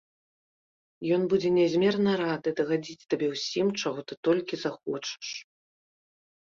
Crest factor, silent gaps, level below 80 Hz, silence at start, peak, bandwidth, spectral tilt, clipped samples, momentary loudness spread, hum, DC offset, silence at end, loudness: 16 dB; 4.17-4.23 s; -70 dBFS; 1 s; -12 dBFS; 7.6 kHz; -5.5 dB/octave; under 0.1%; 10 LU; none; under 0.1%; 1.1 s; -28 LUFS